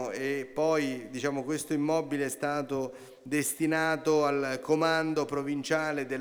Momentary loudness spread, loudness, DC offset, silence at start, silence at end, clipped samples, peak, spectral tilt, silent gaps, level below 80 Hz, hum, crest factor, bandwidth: 7 LU; -30 LUFS; under 0.1%; 0 s; 0 s; under 0.1%; -12 dBFS; -4.5 dB/octave; none; -70 dBFS; none; 16 dB; over 20 kHz